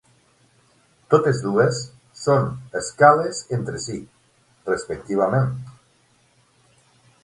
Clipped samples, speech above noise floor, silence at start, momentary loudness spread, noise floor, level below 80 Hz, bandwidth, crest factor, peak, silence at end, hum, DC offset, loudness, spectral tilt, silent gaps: under 0.1%; 40 dB; 1.1 s; 18 LU; -60 dBFS; -56 dBFS; 11.5 kHz; 22 dB; 0 dBFS; 1.5 s; none; under 0.1%; -21 LUFS; -5.5 dB/octave; none